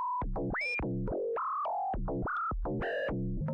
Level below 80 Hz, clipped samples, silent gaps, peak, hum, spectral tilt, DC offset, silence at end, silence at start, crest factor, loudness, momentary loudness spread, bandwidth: -42 dBFS; under 0.1%; none; -28 dBFS; none; -8.5 dB/octave; under 0.1%; 0 s; 0 s; 6 dB; -34 LUFS; 3 LU; 8.8 kHz